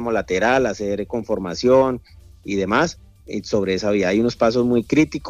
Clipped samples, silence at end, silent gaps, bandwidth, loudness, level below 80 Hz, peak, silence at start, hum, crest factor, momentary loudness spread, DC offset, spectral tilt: under 0.1%; 0 s; none; 12 kHz; -20 LUFS; -46 dBFS; -4 dBFS; 0 s; none; 16 dB; 9 LU; under 0.1%; -5.5 dB/octave